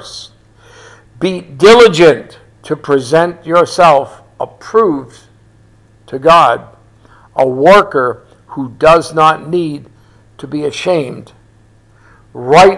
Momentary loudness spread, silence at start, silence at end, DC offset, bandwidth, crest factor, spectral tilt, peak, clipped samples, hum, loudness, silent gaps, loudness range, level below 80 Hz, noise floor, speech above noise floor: 18 LU; 0.05 s; 0 s; under 0.1%; 12 kHz; 12 dB; -5 dB/octave; 0 dBFS; 2%; none; -10 LUFS; none; 5 LU; -44 dBFS; -46 dBFS; 36 dB